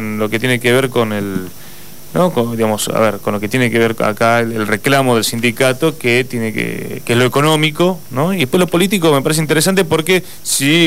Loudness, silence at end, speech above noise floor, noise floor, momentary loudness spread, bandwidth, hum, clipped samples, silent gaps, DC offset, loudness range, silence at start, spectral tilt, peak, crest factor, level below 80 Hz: -14 LUFS; 0 s; 22 dB; -36 dBFS; 7 LU; 16.5 kHz; none; under 0.1%; none; 3%; 3 LU; 0 s; -4.5 dB/octave; -2 dBFS; 14 dB; -50 dBFS